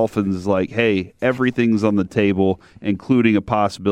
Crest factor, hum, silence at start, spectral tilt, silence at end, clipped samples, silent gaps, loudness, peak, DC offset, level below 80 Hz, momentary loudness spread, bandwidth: 16 dB; none; 0 s; -7.5 dB/octave; 0 s; under 0.1%; none; -19 LUFS; -2 dBFS; under 0.1%; -50 dBFS; 5 LU; 11 kHz